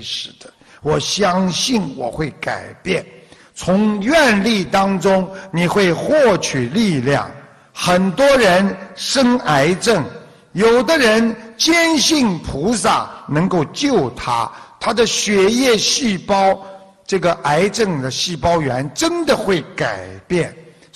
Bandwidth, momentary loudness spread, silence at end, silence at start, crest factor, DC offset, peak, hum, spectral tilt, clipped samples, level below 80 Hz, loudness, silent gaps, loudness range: 13.5 kHz; 11 LU; 0.35 s; 0 s; 14 dB; under 0.1%; -4 dBFS; none; -4 dB/octave; under 0.1%; -44 dBFS; -16 LUFS; none; 3 LU